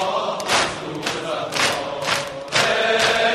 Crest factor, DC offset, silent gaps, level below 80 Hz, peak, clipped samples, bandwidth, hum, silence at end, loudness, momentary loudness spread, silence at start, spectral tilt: 18 dB; under 0.1%; none; -54 dBFS; -4 dBFS; under 0.1%; 15.5 kHz; none; 0 s; -20 LUFS; 8 LU; 0 s; -2 dB/octave